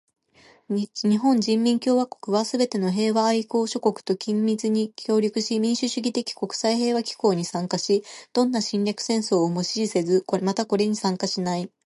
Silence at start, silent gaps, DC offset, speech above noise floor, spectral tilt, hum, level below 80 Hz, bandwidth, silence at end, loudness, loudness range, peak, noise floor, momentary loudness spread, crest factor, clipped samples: 0.7 s; none; under 0.1%; 33 dB; -5 dB/octave; none; -74 dBFS; 11.5 kHz; 0.2 s; -24 LUFS; 2 LU; -6 dBFS; -56 dBFS; 5 LU; 16 dB; under 0.1%